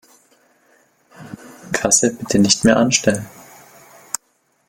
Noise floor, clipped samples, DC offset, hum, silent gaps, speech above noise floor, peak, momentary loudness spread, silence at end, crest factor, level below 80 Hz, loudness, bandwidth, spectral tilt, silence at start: -63 dBFS; under 0.1%; under 0.1%; none; none; 48 dB; 0 dBFS; 24 LU; 1.4 s; 20 dB; -52 dBFS; -16 LUFS; 17 kHz; -3 dB/octave; 1.2 s